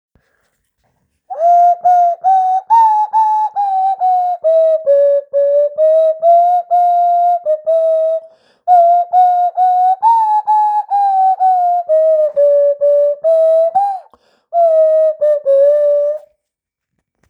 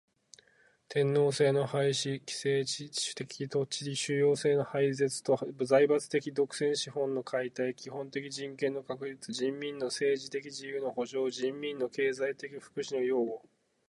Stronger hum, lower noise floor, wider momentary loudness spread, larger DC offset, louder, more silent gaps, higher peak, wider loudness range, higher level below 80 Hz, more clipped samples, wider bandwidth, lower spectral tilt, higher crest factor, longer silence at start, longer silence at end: neither; first, -80 dBFS vs -67 dBFS; second, 5 LU vs 11 LU; neither; first, -12 LUFS vs -32 LUFS; neither; first, -2 dBFS vs -12 dBFS; second, 1 LU vs 6 LU; about the same, -76 dBFS vs -80 dBFS; neither; second, 6.4 kHz vs 11.5 kHz; second, -2.5 dB/octave vs -4.5 dB/octave; second, 10 dB vs 20 dB; first, 1.3 s vs 0.9 s; first, 1.1 s vs 0.5 s